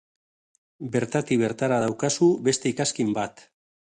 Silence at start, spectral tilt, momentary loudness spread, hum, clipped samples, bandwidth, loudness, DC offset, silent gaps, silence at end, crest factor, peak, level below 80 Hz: 0.8 s; -4.5 dB/octave; 8 LU; none; under 0.1%; 11 kHz; -24 LUFS; under 0.1%; none; 0.55 s; 18 dB; -8 dBFS; -62 dBFS